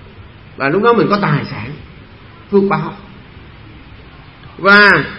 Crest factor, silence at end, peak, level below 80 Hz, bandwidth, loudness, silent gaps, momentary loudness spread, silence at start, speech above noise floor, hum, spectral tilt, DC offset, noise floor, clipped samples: 16 dB; 0 s; 0 dBFS; -44 dBFS; 9 kHz; -12 LUFS; none; 21 LU; 0.2 s; 26 dB; none; -7.5 dB/octave; 0.2%; -38 dBFS; under 0.1%